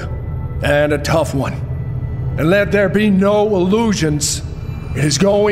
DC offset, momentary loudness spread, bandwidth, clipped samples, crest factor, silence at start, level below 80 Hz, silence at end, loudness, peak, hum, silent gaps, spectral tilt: under 0.1%; 11 LU; 16 kHz; under 0.1%; 14 dB; 0 s; -30 dBFS; 0 s; -16 LUFS; -2 dBFS; none; none; -5.5 dB/octave